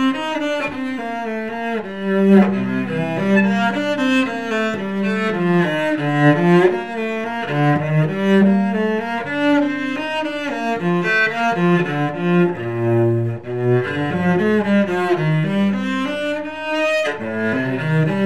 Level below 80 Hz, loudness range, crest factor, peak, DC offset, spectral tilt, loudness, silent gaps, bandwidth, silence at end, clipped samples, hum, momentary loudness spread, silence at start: -60 dBFS; 2 LU; 18 dB; 0 dBFS; 0.6%; -7.5 dB/octave; -18 LUFS; none; 11.5 kHz; 0 s; under 0.1%; none; 9 LU; 0 s